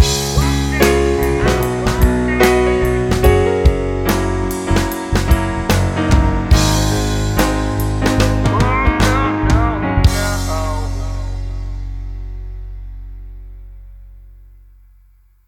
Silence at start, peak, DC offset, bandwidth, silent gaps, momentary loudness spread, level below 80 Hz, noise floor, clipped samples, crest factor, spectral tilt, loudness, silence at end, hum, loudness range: 0 s; 0 dBFS; under 0.1%; 17 kHz; none; 16 LU; -20 dBFS; -49 dBFS; under 0.1%; 16 dB; -5.5 dB/octave; -16 LUFS; 1.05 s; none; 15 LU